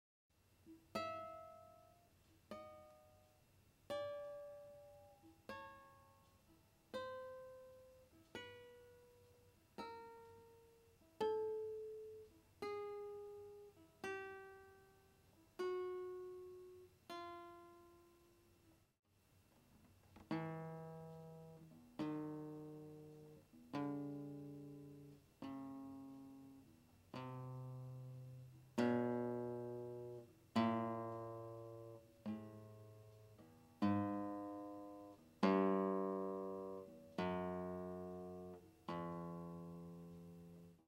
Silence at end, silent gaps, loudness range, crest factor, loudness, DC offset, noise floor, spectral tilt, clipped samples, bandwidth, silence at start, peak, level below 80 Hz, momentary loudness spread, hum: 0.1 s; 18.99-19.03 s; 14 LU; 26 dB; -47 LUFS; under 0.1%; -74 dBFS; -7.5 dB/octave; under 0.1%; 16 kHz; 0.6 s; -24 dBFS; -80 dBFS; 23 LU; none